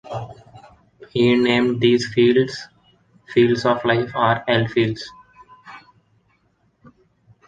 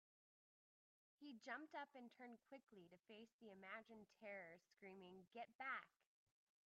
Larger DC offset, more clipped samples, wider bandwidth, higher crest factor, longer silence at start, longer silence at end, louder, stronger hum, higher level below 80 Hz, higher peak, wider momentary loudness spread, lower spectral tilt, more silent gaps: neither; neither; first, 9 kHz vs 7 kHz; about the same, 18 dB vs 22 dB; second, 0.05 s vs 1.2 s; first, 1.7 s vs 0.8 s; first, -18 LUFS vs -58 LUFS; neither; first, -56 dBFS vs under -90 dBFS; first, -2 dBFS vs -38 dBFS; first, 16 LU vs 13 LU; first, -6.5 dB/octave vs -2 dB/octave; second, none vs 3.33-3.39 s, 5.55-5.59 s